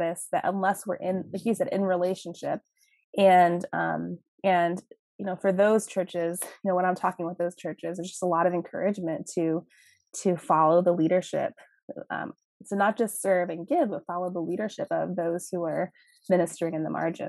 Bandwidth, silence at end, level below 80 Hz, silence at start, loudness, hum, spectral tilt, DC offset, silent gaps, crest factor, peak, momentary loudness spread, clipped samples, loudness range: 13 kHz; 0 s; -80 dBFS; 0 s; -27 LUFS; none; -5.5 dB/octave; under 0.1%; 3.04-3.13 s, 4.28-4.38 s, 4.99-5.19 s, 11.83-11.88 s, 12.45-12.60 s; 18 dB; -8 dBFS; 12 LU; under 0.1%; 4 LU